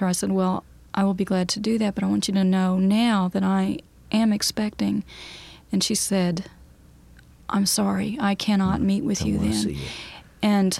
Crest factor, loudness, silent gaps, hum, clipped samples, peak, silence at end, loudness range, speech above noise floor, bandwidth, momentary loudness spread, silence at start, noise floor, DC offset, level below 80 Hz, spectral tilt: 14 dB; -23 LUFS; none; none; under 0.1%; -8 dBFS; 0 s; 3 LU; 28 dB; 15 kHz; 12 LU; 0 s; -50 dBFS; under 0.1%; -46 dBFS; -5 dB/octave